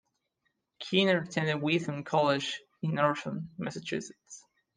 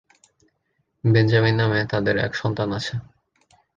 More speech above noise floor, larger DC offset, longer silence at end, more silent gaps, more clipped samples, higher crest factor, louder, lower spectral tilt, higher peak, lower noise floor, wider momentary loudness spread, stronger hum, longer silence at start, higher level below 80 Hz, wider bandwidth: about the same, 49 dB vs 52 dB; neither; second, 0.35 s vs 0.75 s; neither; neither; about the same, 20 dB vs 18 dB; second, -30 LUFS vs -21 LUFS; second, -5 dB/octave vs -7 dB/octave; second, -12 dBFS vs -4 dBFS; first, -80 dBFS vs -72 dBFS; first, 18 LU vs 10 LU; neither; second, 0.8 s vs 1.05 s; second, -74 dBFS vs -52 dBFS; first, 9.8 kHz vs 7.4 kHz